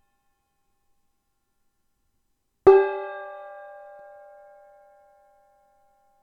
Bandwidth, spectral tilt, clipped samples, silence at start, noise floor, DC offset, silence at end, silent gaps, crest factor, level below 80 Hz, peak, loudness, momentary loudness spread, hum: 4.7 kHz; -7.5 dB/octave; under 0.1%; 2.65 s; -74 dBFS; under 0.1%; 2.85 s; none; 26 dB; -62 dBFS; -2 dBFS; -20 LUFS; 28 LU; none